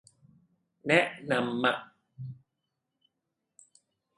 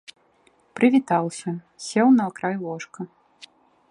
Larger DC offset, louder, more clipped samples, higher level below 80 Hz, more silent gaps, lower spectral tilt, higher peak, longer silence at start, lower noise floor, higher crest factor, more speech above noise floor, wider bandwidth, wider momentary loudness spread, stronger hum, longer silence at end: neither; second, -28 LUFS vs -22 LUFS; neither; about the same, -76 dBFS vs -74 dBFS; neither; about the same, -5 dB/octave vs -6 dB/octave; about the same, -8 dBFS vs -6 dBFS; about the same, 0.85 s vs 0.75 s; first, -84 dBFS vs -61 dBFS; first, 26 dB vs 18 dB; first, 56 dB vs 39 dB; about the same, 11.5 kHz vs 10.5 kHz; about the same, 20 LU vs 19 LU; neither; first, 1.85 s vs 0.85 s